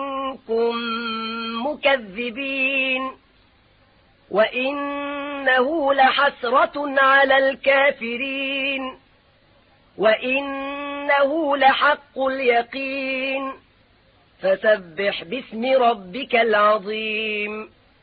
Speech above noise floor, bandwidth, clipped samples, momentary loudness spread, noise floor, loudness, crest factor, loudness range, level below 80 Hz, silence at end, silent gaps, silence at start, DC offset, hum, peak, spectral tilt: 37 dB; 5 kHz; under 0.1%; 11 LU; -57 dBFS; -20 LUFS; 18 dB; 6 LU; -60 dBFS; 0.35 s; none; 0 s; under 0.1%; none; -4 dBFS; -8 dB/octave